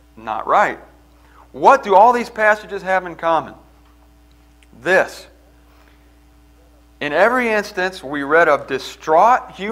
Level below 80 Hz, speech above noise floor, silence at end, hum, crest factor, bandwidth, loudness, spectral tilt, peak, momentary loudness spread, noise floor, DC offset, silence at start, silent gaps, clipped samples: -50 dBFS; 33 dB; 0 s; none; 18 dB; 16 kHz; -16 LUFS; -4.5 dB/octave; 0 dBFS; 14 LU; -49 dBFS; under 0.1%; 0.2 s; none; under 0.1%